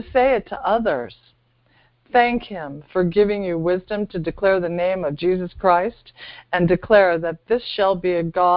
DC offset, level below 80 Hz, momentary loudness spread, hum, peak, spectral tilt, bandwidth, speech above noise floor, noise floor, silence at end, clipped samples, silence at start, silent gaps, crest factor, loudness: under 0.1%; -46 dBFS; 10 LU; none; 0 dBFS; -11 dB/octave; 5.4 kHz; 40 dB; -60 dBFS; 0 s; under 0.1%; 0 s; none; 20 dB; -20 LUFS